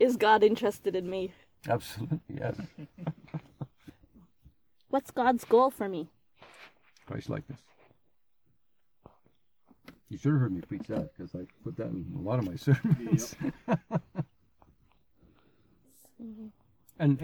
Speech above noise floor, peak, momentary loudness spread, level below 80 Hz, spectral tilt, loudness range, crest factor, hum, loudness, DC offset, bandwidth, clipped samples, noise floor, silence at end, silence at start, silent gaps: 49 dB; -10 dBFS; 21 LU; -62 dBFS; -7 dB/octave; 13 LU; 22 dB; none; -31 LUFS; under 0.1%; 20 kHz; under 0.1%; -79 dBFS; 0 s; 0 s; none